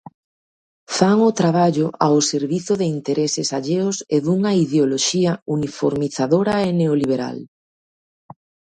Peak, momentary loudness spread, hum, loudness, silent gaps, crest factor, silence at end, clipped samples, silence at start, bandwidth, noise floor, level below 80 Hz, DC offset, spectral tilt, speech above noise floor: 0 dBFS; 6 LU; none; -19 LUFS; 5.42-5.46 s; 20 dB; 1.3 s; under 0.1%; 0.9 s; 10.5 kHz; under -90 dBFS; -58 dBFS; under 0.1%; -5 dB/octave; over 72 dB